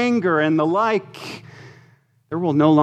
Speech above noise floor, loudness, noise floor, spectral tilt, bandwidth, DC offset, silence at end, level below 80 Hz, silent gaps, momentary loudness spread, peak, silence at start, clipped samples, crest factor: 37 dB; -19 LUFS; -55 dBFS; -7.5 dB/octave; 9 kHz; under 0.1%; 0 s; -68 dBFS; none; 17 LU; -4 dBFS; 0 s; under 0.1%; 16 dB